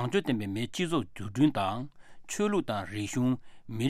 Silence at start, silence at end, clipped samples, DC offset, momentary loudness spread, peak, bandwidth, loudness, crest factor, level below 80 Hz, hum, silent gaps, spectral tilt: 0 s; 0 s; under 0.1%; under 0.1%; 11 LU; -14 dBFS; 15.5 kHz; -31 LUFS; 16 dB; -60 dBFS; none; none; -5.5 dB/octave